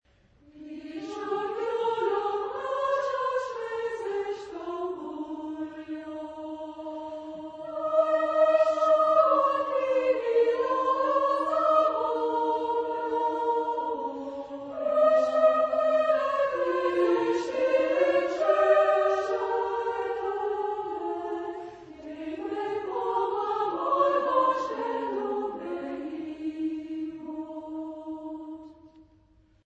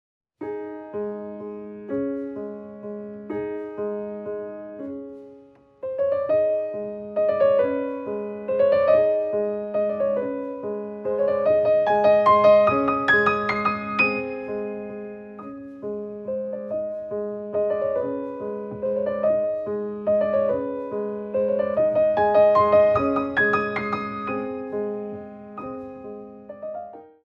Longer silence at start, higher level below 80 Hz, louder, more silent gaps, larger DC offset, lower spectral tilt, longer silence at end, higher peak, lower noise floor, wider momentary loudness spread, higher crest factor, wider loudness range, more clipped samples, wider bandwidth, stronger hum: first, 0.55 s vs 0.4 s; second, -68 dBFS vs -60 dBFS; second, -27 LUFS vs -23 LUFS; neither; neither; second, -5 dB/octave vs -7.5 dB/octave; first, 0.65 s vs 0.2 s; second, -10 dBFS vs -6 dBFS; first, -61 dBFS vs -50 dBFS; second, 15 LU vs 18 LU; about the same, 18 dB vs 18 dB; about the same, 11 LU vs 12 LU; neither; first, 8.4 kHz vs 5.6 kHz; neither